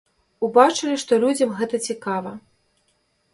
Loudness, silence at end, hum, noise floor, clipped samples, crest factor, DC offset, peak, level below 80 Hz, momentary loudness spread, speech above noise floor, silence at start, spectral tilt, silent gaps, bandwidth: -20 LUFS; 0.95 s; none; -67 dBFS; under 0.1%; 22 dB; under 0.1%; 0 dBFS; -68 dBFS; 12 LU; 47 dB; 0.4 s; -4 dB/octave; none; 11.5 kHz